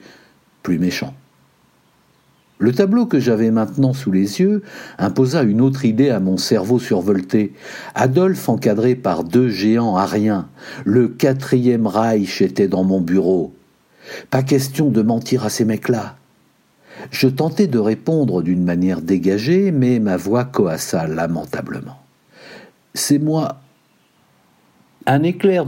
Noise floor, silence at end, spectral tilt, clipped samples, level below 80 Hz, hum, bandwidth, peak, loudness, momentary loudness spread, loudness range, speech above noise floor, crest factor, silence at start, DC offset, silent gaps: -57 dBFS; 0 s; -6.5 dB/octave; under 0.1%; -58 dBFS; none; 16.5 kHz; -2 dBFS; -17 LUFS; 10 LU; 5 LU; 41 dB; 16 dB; 0.65 s; under 0.1%; none